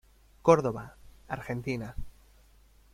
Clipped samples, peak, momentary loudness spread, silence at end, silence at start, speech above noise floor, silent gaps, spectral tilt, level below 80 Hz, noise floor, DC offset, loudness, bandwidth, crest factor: under 0.1%; -6 dBFS; 20 LU; 0.85 s; 0.45 s; 31 dB; none; -7 dB/octave; -50 dBFS; -59 dBFS; under 0.1%; -29 LUFS; 14.5 kHz; 26 dB